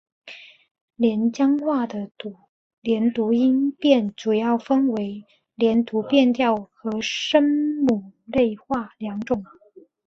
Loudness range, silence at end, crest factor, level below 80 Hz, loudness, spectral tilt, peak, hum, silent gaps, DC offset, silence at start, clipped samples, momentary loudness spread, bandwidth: 2 LU; 0.6 s; 18 dB; -60 dBFS; -22 LUFS; -5.5 dB/octave; -4 dBFS; none; 0.71-0.75 s, 0.81-0.88 s, 2.49-2.82 s; under 0.1%; 0.25 s; under 0.1%; 13 LU; 7.4 kHz